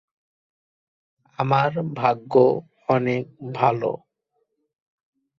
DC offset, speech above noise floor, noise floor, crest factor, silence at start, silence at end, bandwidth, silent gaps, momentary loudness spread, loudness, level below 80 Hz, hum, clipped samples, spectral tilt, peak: under 0.1%; 53 dB; -74 dBFS; 20 dB; 1.4 s; 1.45 s; 6.8 kHz; none; 10 LU; -22 LUFS; -64 dBFS; none; under 0.1%; -8.5 dB/octave; -4 dBFS